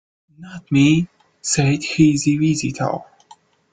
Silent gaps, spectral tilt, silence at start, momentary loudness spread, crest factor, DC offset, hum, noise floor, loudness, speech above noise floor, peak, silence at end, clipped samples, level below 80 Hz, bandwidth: none; -5 dB/octave; 0.4 s; 15 LU; 16 dB; under 0.1%; none; -50 dBFS; -18 LUFS; 33 dB; -2 dBFS; 0.75 s; under 0.1%; -52 dBFS; 9.6 kHz